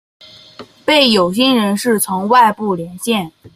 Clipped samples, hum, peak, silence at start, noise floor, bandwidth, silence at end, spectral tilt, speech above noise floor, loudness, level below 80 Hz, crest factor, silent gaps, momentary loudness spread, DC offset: under 0.1%; none; 0 dBFS; 0.6 s; -39 dBFS; 16 kHz; 0.05 s; -3.5 dB/octave; 25 dB; -14 LUFS; -56 dBFS; 14 dB; none; 10 LU; under 0.1%